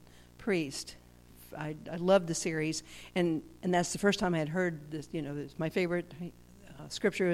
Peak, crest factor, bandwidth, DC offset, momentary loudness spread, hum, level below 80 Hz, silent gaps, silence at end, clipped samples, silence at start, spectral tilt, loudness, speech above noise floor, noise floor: -14 dBFS; 20 dB; 16 kHz; under 0.1%; 14 LU; 60 Hz at -50 dBFS; -60 dBFS; none; 0 s; under 0.1%; 0.2 s; -5 dB/octave; -33 LUFS; 23 dB; -55 dBFS